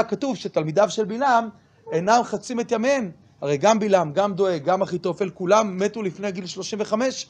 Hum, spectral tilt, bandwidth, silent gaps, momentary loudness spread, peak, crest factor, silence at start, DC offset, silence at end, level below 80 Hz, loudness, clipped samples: none; -5 dB/octave; 9.8 kHz; none; 9 LU; -4 dBFS; 18 dB; 0 s; under 0.1%; 0.05 s; -66 dBFS; -22 LUFS; under 0.1%